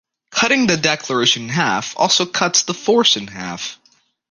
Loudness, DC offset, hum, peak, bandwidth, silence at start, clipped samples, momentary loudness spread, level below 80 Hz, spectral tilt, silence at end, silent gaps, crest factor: -16 LUFS; under 0.1%; none; 0 dBFS; 11 kHz; 0.3 s; under 0.1%; 12 LU; -58 dBFS; -2.5 dB/octave; 0.55 s; none; 18 dB